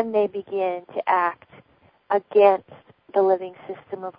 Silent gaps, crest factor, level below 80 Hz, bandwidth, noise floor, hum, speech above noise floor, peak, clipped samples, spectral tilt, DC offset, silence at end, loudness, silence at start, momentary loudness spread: none; 20 dB; -74 dBFS; 5.2 kHz; -59 dBFS; none; 37 dB; -4 dBFS; under 0.1%; -9.5 dB/octave; under 0.1%; 0.1 s; -22 LUFS; 0 s; 18 LU